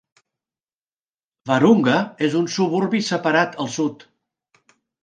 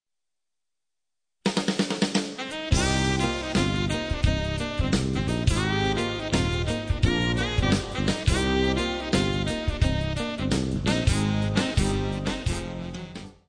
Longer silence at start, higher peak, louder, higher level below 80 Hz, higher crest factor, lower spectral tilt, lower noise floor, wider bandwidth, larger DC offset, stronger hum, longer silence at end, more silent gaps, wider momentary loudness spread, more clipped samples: about the same, 1.45 s vs 1.45 s; first, -2 dBFS vs -8 dBFS; first, -19 LUFS vs -26 LUFS; second, -70 dBFS vs -34 dBFS; about the same, 20 dB vs 18 dB; about the same, -5.5 dB/octave vs -5 dB/octave; about the same, under -90 dBFS vs -89 dBFS; about the same, 9.6 kHz vs 10.5 kHz; neither; neither; first, 1.1 s vs 0.15 s; neither; first, 9 LU vs 5 LU; neither